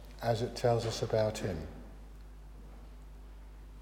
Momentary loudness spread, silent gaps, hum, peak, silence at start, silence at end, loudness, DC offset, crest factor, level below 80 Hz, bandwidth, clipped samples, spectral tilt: 22 LU; none; 50 Hz at -50 dBFS; -16 dBFS; 0 s; 0 s; -33 LUFS; under 0.1%; 20 dB; -50 dBFS; 16.5 kHz; under 0.1%; -5.5 dB/octave